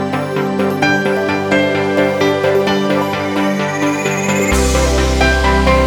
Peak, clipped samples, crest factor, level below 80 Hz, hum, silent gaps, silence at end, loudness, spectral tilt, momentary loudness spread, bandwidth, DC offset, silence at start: 0 dBFS; under 0.1%; 14 dB; -22 dBFS; none; none; 0 s; -14 LUFS; -5 dB/octave; 4 LU; 19 kHz; under 0.1%; 0 s